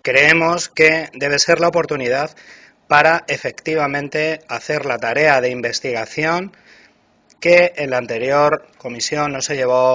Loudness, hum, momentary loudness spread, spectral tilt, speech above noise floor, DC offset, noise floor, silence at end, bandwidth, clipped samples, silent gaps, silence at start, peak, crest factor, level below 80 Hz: -16 LUFS; none; 10 LU; -3.5 dB/octave; 39 dB; under 0.1%; -55 dBFS; 0 s; 8 kHz; under 0.1%; none; 0.05 s; 0 dBFS; 18 dB; -56 dBFS